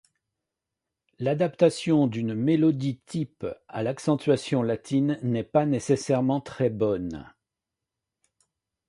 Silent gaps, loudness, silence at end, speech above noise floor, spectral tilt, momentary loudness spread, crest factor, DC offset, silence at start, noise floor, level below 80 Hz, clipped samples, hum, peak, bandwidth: none; -26 LUFS; 1.6 s; 62 dB; -7 dB/octave; 10 LU; 20 dB; under 0.1%; 1.2 s; -87 dBFS; -60 dBFS; under 0.1%; none; -6 dBFS; 11.5 kHz